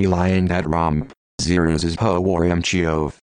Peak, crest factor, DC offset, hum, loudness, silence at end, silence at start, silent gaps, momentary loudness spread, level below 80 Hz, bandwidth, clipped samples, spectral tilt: -4 dBFS; 16 dB; under 0.1%; none; -20 LUFS; 0.25 s; 0 s; 1.17-1.38 s; 6 LU; -36 dBFS; 10.5 kHz; under 0.1%; -6 dB/octave